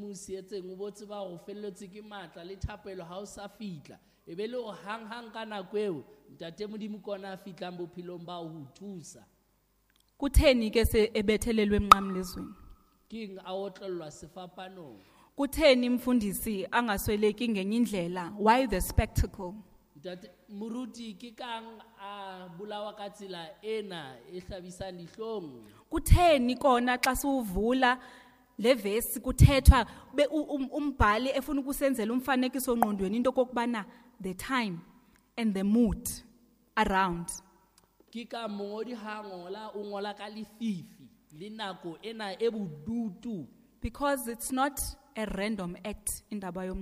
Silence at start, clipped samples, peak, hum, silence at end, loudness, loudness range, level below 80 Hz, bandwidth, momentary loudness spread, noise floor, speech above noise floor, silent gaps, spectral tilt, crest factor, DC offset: 0 s; under 0.1%; -2 dBFS; none; 0 s; -30 LUFS; 15 LU; -40 dBFS; 15.5 kHz; 19 LU; -71 dBFS; 40 dB; none; -5.5 dB/octave; 28 dB; under 0.1%